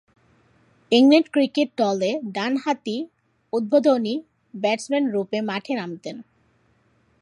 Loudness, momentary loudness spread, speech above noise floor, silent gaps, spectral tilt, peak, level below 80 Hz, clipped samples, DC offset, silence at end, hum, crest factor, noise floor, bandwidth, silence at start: -22 LUFS; 16 LU; 42 dB; none; -5 dB/octave; -4 dBFS; -74 dBFS; under 0.1%; under 0.1%; 1 s; none; 20 dB; -63 dBFS; 11.5 kHz; 0.9 s